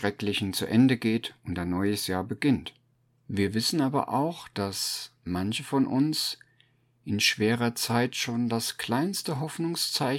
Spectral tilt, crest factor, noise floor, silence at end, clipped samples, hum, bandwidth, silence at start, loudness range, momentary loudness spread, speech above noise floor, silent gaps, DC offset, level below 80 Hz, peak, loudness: -4.5 dB/octave; 18 dB; -67 dBFS; 0 s; under 0.1%; none; 17.5 kHz; 0 s; 2 LU; 10 LU; 39 dB; none; under 0.1%; -62 dBFS; -10 dBFS; -27 LUFS